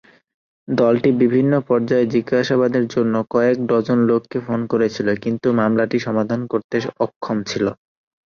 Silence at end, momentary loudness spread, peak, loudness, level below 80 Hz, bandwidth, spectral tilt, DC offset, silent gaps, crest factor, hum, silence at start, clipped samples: 0.65 s; 7 LU; -4 dBFS; -19 LUFS; -58 dBFS; 7 kHz; -7 dB/octave; under 0.1%; 6.64-6.69 s, 7.16-7.21 s; 14 dB; none; 0.7 s; under 0.1%